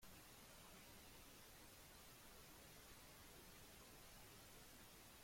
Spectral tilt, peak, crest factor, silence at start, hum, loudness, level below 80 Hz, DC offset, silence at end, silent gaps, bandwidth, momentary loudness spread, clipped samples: -2.5 dB/octave; -50 dBFS; 14 dB; 0 s; none; -62 LUFS; -72 dBFS; under 0.1%; 0 s; none; 16.5 kHz; 0 LU; under 0.1%